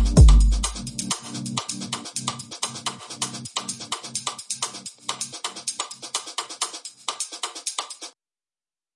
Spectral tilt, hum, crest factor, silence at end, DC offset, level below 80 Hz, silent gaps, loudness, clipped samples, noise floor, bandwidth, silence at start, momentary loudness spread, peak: -3.5 dB/octave; none; 22 dB; 0.85 s; under 0.1%; -26 dBFS; none; -26 LUFS; under 0.1%; under -90 dBFS; 11.5 kHz; 0 s; 8 LU; -2 dBFS